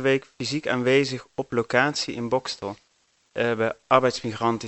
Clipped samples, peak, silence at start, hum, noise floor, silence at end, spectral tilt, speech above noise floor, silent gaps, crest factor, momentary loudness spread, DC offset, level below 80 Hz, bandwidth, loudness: under 0.1%; 0 dBFS; 0 s; none; -66 dBFS; 0 s; -4.5 dB/octave; 42 dB; none; 24 dB; 11 LU; under 0.1%; -62 dBFS; 8.4 kHz; -24 LUFS